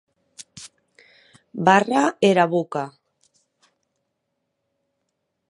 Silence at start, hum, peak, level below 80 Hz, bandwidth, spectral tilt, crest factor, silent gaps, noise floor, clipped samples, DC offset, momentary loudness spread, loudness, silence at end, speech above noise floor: 0.55 s; none; 0 dBFS; -74 dBFS; 11.5 kHz; -5.5 dB/octave; 24 dB; none; -77 dBFS; under 0.1%; under 0.1%; 24 LU; -19 LUFS; 2.6 s; 58 dB